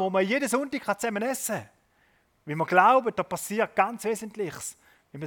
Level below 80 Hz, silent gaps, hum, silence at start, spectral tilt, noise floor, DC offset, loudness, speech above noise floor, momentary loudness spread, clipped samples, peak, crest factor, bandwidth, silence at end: -70 dBFS; none; none; 0 s; -4 dB/octave; -66 dBFS; under 0.1%; -26 LUFS; 40 dB; 14 LU; under 0.1%; -6 dBFS; 22 dB; 18 kHz; 0 s